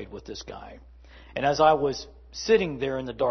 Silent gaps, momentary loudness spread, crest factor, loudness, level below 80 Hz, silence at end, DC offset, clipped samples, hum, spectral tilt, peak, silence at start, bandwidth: none; 20 LU; 20 dB; -24 LUFS; -50 dBFS; 0 s; under 0.1%; under 0.1%; none; -4.5 dB/octave; -6 dBFS; 0 s; 6.4 kHz